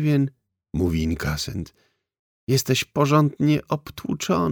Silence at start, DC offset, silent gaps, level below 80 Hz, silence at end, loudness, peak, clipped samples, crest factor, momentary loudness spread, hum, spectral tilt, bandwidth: 0 s; under 0.1%; 2.19-2.47 s; -42 dBFS; 0 s; -23 LUFS; -4 dBFS; under 0.1%; 20 dB; 12 LU; none; -5.5 dB/octave; 19.5 kHz